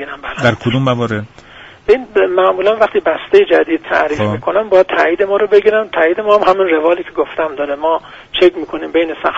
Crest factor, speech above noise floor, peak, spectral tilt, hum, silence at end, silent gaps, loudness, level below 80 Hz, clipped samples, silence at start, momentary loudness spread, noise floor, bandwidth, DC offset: 14 dB; 25 dB; 0 dBFS; -6.5 dB/octave; none; 0 s; none; -13 LUFS; -46 dBFS; under 0.1%; 0 s; 8 LU; -38 dBFS; 8 kHz; under 0.1%